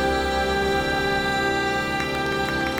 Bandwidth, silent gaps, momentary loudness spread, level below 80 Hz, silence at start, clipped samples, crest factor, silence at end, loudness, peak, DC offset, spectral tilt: 17.5 kHz; none; 2 LU; -38 dBFS; 0 s; under 0.1%; 14 dB; 0 s; -23 LUFS; -8 dBFS; under 0.1%; -4.5 dB/octave